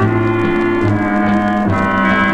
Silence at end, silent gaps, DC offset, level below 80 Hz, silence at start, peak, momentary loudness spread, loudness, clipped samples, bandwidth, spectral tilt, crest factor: 0 s; none; under 0.1%; -36 dBFS; 0 s; 0 dBFS; 2 LU; -14 LUFS; under 0.1%; 8.8 kHz; -8 dB/octave; 12 dB